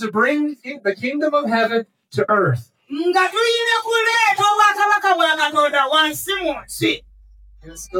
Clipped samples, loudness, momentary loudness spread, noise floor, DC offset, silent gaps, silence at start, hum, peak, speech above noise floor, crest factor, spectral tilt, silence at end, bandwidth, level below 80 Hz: under 0.1%; -17 LUFS; 10 LU; -46 dBFS; under 0.1%; none; 0 s; none; -2 dBFS; 28 dB; 16 dB; -3.5 dB/octave; 0 s; 19 kHz; -52 dBFS